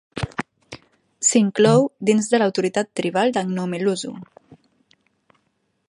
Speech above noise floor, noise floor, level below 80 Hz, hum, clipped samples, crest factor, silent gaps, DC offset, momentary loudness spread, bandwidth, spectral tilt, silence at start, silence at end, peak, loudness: 51 dB; -70 dBFS; -56 dBFS; none; under 0.1%; 20 dB; none; under 0.1%; 20 LU; 11 kHz; -4.5 dB/octave; 0.15 s; 1.65 s; -2 dBFS; -20 LUFS